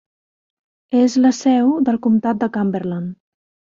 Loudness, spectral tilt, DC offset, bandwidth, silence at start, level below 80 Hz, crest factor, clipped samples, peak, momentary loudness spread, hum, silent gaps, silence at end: -17 LUFS; -6.5 dB/octave; under 0.1%; 7.6 kHz; 0.9 s; -62 dBFS; 14 dB; under 0.1%; -4 dBFS; 10 LU; none; none; 0.65 s